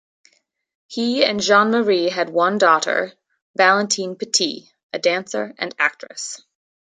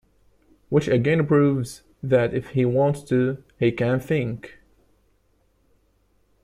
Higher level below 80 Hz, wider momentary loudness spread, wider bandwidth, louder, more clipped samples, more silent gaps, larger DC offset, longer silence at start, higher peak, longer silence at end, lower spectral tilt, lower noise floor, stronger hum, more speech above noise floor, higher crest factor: second, -70 dBFS vs -54 dBFS; first, 15 LU vs 9 LU; second, 9.6 kHz vs 14.5 kHz; first, -18 LUFS vs -22 LUFS; neither; first, 3.42-3.54 s, 4.83-4.90 s vs none; neither; first, 0.9 s vs 0.7 s; first, -2 dBFS vs -6 dBFS; second, 0.55 s vs 1.95 s; second, -2.5 dB/octave vs -8 dB/octave; second, -59 dBFS vs -64 dBFS; neither; about the same, 41 dB vs 43 dB; about the same, 20 dB vs 18 dB